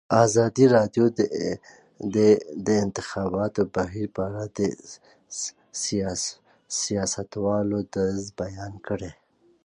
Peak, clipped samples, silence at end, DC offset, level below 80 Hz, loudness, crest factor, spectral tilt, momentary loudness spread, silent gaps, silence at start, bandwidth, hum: -6 dBFS; under 0.1%; 0.5 s; under 0.1%; -54 dBFS; -25 LUFS; 20 dB; -5 dB/octave; 14 LU; none; 0.1 s; 10.5 kHz; none